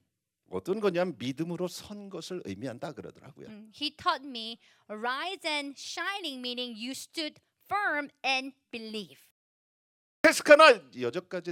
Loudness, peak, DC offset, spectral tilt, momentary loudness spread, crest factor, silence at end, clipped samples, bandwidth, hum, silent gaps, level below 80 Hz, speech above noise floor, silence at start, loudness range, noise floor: -28 LUFS; -4 dBFS; under 0.1%; -3.5 dB/octave; 18 LU; 28 dB; 0 s; under 0.1%; 16.5 kHz; none; 9.31-10.24 s; -76 dBFS; 45 dB; 0.5 s; 11 LU; -74 dBFS